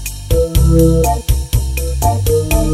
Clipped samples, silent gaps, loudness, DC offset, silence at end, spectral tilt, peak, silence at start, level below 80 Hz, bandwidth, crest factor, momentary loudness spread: under 0.1%; none; -14 LUFS; under 0.1%; 0 s; -6 dB/octave; 0 dBFS; 0 s; -16 dBFS; 16 kHz; 12 dB; 7 LU